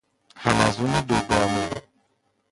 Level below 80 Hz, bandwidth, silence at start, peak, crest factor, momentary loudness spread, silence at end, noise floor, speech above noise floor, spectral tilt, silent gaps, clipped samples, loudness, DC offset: -46 dBFS; 11.5 kHz; 0.35 s; -4 dBFS; 22 dB; 9 LU; 0.7 s; -69 dBFS; 48 dB; -5 dB/octave; none; under 0.1%; -23 LUFS; under 0.1%